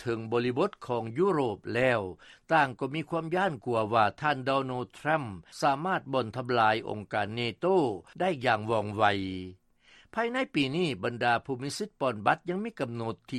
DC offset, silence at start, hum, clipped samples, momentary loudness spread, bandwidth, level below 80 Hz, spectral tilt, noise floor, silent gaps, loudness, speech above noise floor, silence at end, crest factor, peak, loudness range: under 0.1%; 0 s; none; under 0.1%; 8 LU; 13 kHz; -66 dBFS; -6 dB/octave; -60 dBFS; none; -29 LUFS; 31 dB; 0 s; 20 dB; -10 dBFS; 2 LU